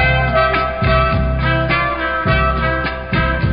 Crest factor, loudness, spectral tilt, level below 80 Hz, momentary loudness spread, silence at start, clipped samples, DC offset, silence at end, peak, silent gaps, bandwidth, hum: 14 dB; -16 LUFS; -11.5 dB/octave; -22 dBFS; 4 LU; 0 s; under 0.1%; under 0.1%; 0 s; -2 dBFS; none; 5.2 kHz; none